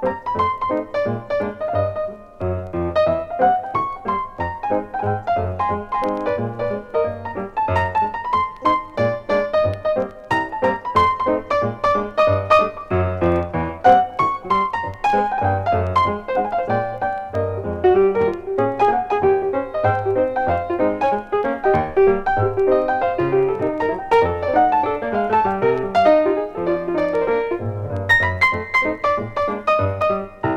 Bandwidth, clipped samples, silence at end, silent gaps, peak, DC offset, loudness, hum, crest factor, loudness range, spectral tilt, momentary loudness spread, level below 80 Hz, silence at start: 9.8 kHz; under 0.1%; 0 s; none; -2 dBFS; under 0.1%; -19 LUFS; none; 18 dB; 4 LU; -7.5 dB/octave; 8 LU; -44 dBFS; 0 s